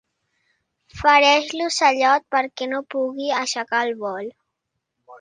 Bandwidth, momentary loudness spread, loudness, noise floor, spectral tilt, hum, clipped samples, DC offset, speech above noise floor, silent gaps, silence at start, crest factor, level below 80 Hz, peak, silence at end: 9.8 kHz; 13 LU; -19 LUFS; -79 dBFS; -2 dB/octave; none; under 0.1%; under 0.1%; 59 dB; none; 0.95 s; 22 dB; -56 dBFS; 0 dBFS; 0.05 s